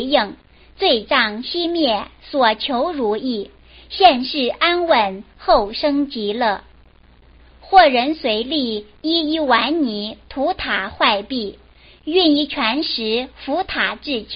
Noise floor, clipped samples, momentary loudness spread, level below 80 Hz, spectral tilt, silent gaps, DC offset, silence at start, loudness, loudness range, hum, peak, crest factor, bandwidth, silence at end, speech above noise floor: -49 dBFS; under 0.1%; 11 LU; -46 dBFS; -0.5 dB/octave; none; under 0.1%; 0 s; -18 LUFS; 2 LU; none; 0 dBFS; 18 dB; 5.6 kHz; 0 s; 31 dB